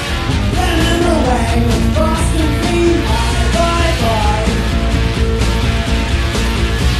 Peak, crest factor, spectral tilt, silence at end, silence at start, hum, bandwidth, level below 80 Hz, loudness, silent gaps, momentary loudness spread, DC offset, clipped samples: -2 dBFS; 12 dB; -5.5 dB/octave; 0 s; 0 s; none; 14 kHz; -18 dBFS; -14 LUFS; none; 3 LU; under 0.1%; under 0.1%